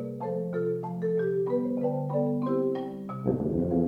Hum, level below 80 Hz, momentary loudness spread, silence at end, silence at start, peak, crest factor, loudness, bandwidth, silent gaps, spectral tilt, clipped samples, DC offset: none; -56 dBFS; 5 LU; 0 s; 0 s; -12 dBFS; 16 dB; -29 LUFS; 5 kHz; none; -10.5 dB/octave; under 0.1%; under 0.1%